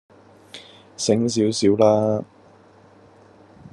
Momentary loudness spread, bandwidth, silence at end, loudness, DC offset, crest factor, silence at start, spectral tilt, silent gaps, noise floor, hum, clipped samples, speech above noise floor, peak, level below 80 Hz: 24 LU; 11.5 kHz; 0.05 s; -19 LUFS; under 0.1%; 20 dB; 0.55 s; -5.5 dB/octave; none; -51 dBFS; none; under 0.1%; 32 dB; -4 dBFS; -66 dBFS